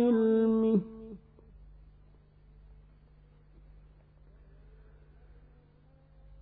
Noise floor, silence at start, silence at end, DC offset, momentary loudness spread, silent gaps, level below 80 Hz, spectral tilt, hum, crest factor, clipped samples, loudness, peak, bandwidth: -60 dBFS; 0 s; 5.25 s; under 0.1%; 24 LU; none; -58 dBFS; -11.5 dB/octave; 50 Hz at -60 dBFS; 18 dB; under 0.1%; -27 LUFS; -18 dBFS; 4 kHz